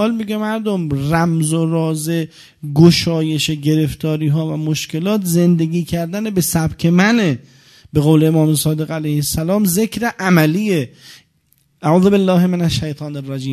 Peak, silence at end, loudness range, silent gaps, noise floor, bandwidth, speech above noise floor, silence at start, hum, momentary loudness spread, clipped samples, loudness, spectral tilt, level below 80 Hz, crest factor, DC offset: 0 dBFS; 0 s; 2 LU; none; -59 dBFS; 14 kHz; 44 dB; 0 s; none; 9 LU; under 0.1%; -16 LUFS; -6 dB/octave; -42 dBFS; 16 dB; under 0.1%